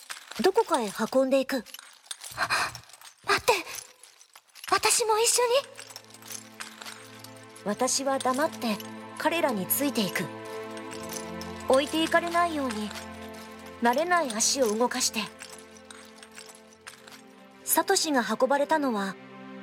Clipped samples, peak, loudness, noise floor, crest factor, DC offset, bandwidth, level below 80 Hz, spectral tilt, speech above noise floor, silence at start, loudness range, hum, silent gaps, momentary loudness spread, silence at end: under 0.1%; -8 dBFS; -26 LUFS; -55 dBFS; 22 dB; under 0.1%; 18 kHz; -68 dBFS; -2 dB/octave; 29 dB; 0 s; 4 LU; none; none; 22 LU; 0 s